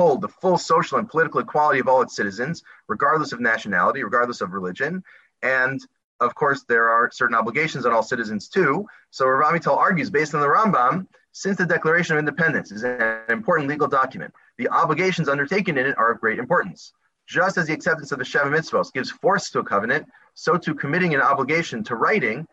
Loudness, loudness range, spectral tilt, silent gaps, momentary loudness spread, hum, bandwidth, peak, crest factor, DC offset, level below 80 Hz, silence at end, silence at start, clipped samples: -21 LUFS; 3 LU; -5.5 dB/octave; 6.04-6.19 s; 8 LU; none; 8.2 kHz; -6 dBFS; 16 dB; under 0.1%; -66 dBFS; 0.05 s; 0 s; under 0.1%